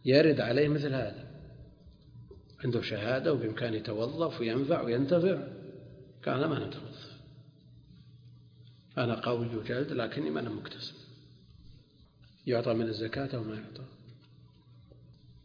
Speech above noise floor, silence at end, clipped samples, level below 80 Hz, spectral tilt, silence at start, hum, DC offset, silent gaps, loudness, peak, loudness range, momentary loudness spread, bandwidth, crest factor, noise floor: 29 dB; 0.15 s; under 0.1%; -62 dBFS; -5.5 dB/octave; 0.05 s; none; under 0.1%; none; -32 LUFS; -10 dBFS; 7 LU; 22 LU; 5.2 kHz; 22 dB; -60 dBFS